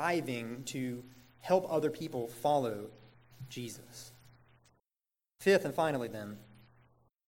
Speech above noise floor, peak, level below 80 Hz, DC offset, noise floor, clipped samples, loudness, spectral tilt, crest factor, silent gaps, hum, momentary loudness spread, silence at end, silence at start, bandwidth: over 56 dB; -14 dBFS; -74 dBFS; under 0.1%; under -90 dBFS; under 0.1%; -34 LUFS; -5 dB/octave; 22 dB; none; none; 21 LU; 0.75 s; 0 s; 17 kHz